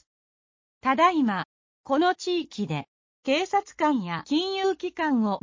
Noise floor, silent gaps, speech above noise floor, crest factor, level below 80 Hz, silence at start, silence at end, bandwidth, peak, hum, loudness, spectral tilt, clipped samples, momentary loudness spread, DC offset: under -90 dBFS; 1.45-1.84 s, 2.88-3.23 s; over 65 dB; 20 dB; -68 dBFS; 0.85 s; 0.05 s; 7.6 kHz; -8 dBFS; none; -26 LUFS; -5 dB/octave; under 0.1%; 10 LU; under 0.1%